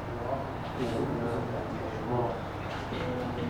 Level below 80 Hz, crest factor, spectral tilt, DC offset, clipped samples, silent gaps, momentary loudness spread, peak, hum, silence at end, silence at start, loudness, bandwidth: -48 dBFS; 14 dB; -7 dB/octave; under 0.1%; under 0.1%; none; 5 LU; -20 dBFS; none; 0 s; 0 s; -33 LUFS; 19.5 kHz